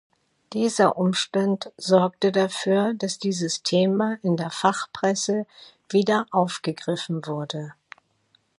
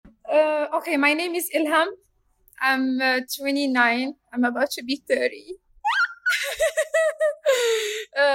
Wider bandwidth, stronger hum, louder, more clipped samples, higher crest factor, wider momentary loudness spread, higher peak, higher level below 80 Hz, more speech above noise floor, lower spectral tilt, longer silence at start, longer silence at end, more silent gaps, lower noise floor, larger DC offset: second, 11.5 kHz vs 16.5 kHz; neither; about the same, -24 LUFS vs -23 LUFS; neither; about the same, 20 dB vs 18 dB; about the same, 9 LU vs 7 LU; about the same, -4 dBFS vs -6 dBFS; second, -72 dBFS vs -64 dBFS; first, 42 dB vs 38 dB; first, -5 dB/octave vs -1.5 dB/octave; first, 0.5 s vs 0.05 s; first, 0.9 s vs 0 s; neither; first, -66 dBFS vs -61 dBFS; neither